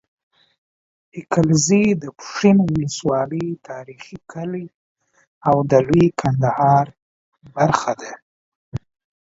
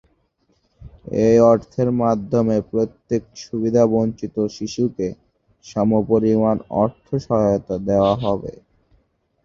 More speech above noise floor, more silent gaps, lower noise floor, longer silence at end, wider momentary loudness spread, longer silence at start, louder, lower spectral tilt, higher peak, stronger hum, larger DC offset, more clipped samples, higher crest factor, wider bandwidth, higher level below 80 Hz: first, over 72 dB vs 46 dB; first, 4.74-4.96 s, 5.27-5.41 s, 7.02-7.32 s, 8.22-8.72 s vs none; first, under -90 dBFS vs -65 dBFS; second, 0.45 s vs 0.95 s; first, 20 LU vs 10 LU; first, 1.15 s vs 0.8 s; about the same, -18 LUFS vs -19 LUFS; second, -6 dB/octave vs -8 dB/octave; about the same, 0 dBFS vs -2 dBFS; neither; neither; neither; about the same, 20 dB vs 18 dB; about the same, 8 kHz vs 7.4 kHz; about the same, -50 dBFS vs -48 dBFS